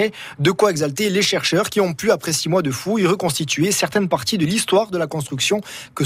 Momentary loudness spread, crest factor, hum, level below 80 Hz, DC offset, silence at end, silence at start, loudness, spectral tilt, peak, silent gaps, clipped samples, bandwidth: 5 LU; 16 dB; none; -56 dBFS; under 0.1%; 0 s; 0 s; -19 LUFS; -4 dB/octave; -4 dBFS; none; under 0.1%; 16 kHz